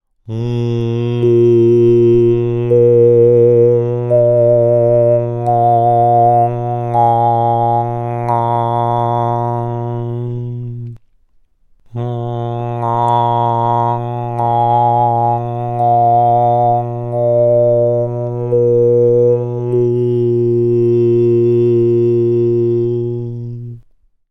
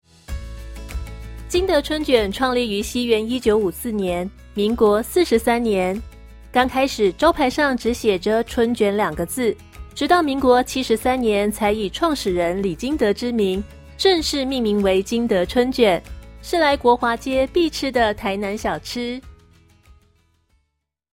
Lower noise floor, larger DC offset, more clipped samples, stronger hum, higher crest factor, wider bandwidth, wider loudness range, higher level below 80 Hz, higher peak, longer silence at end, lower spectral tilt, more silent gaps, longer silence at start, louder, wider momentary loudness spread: second, -51 dBFS vs -74 dBFS; neither; neither; neither; second, 12 dB vs 18 dB; second, 5.8 kHz vs 16.5 kHz; first, 8 LU vs 2 LU; second, -44 dBFS vs -38 dBFS; about the same, -2 dBFS vs -4 dBFS; second, 0.5 s vs 1.85 s; first, -10.5 dB/octave vs -4.5 dB/octave; neither; about the same, 0.25 s vs 0.3 s; first, -13 LUFS vs -20 LUFS; about the same, 11 LU vs 12 LU